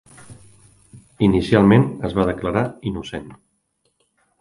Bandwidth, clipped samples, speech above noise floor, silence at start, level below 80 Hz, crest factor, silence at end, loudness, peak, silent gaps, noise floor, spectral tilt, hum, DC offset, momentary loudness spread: 11.5 kHz; under 0.1%; 51 dB; 0.3 s; -42 dBFS; 20 dB; 1.05 s; -18 LUFS; 0 dBFS; none; -69 dBFS; -8 dB/octave; none; under 0.1%; 16 LU